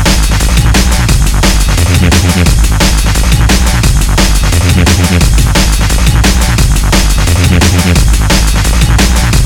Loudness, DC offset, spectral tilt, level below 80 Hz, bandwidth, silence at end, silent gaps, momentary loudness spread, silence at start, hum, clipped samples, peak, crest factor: -8 LUFS; under 0.1%; -4 dB/octave; -10 dBFS; 18 kHz; 0 s; none; 2 LU; 0 s; none; 0.9%; 0 dBFS; 6 dB